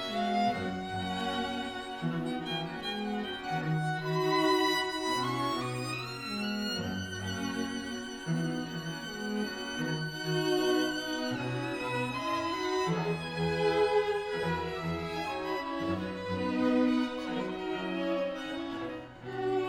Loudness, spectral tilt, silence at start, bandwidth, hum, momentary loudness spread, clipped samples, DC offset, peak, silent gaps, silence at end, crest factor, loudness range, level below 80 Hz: -32 LUFS; -5 dB/octave; 0 s; 18 kHz; none; 8 LU; under 0.1%; under 0.1%; -16 dBFS; none; 0 s; 16 dB; 4 LU; -60 dBFS